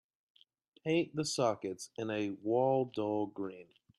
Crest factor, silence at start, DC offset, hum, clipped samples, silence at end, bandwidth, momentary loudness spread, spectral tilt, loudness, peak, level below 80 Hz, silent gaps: 18 dB; 0.85 s; under 0.1%; none; under 0.1%; 0.35 s; 12.5 kHz; 12 LU; -5 dB/octave; -35 LUFS; -18 dBFS; -80 dBFS; none